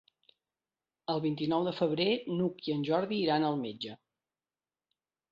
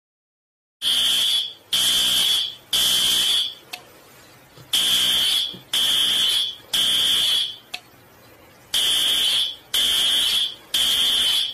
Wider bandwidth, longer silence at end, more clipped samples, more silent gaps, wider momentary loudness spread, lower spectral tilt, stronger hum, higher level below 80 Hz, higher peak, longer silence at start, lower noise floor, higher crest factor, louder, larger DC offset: second, 7.4 kHz vs 14.5 kHz; first, 1.35 s vs 0 s; neither; neither; first, 10 LU vs 7 LU; first, -8 dB/octave vs 1.5 dB/octave; neither; second, -74 dBFS vs -56 dBFS; second, -16 dBFS vs -8 dBFS; first, 1.1 s vs 0.8 s; first, under -90 dBFS vs -49 dBFS; about the same, 18 dB vs 14 dB; second, -32 LUFS vs -18 LUFS; neither